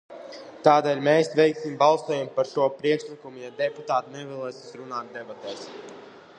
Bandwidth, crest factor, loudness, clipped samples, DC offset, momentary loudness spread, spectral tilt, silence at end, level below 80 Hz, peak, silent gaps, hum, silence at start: 10 kHz; 22 dB; -24 LUFS; under 0.1%; under 0.1%; 21 LU; -5.5 dB/octave; 0.2 s; -76 dBFS; -4 dBFS; none; none; 0.1 s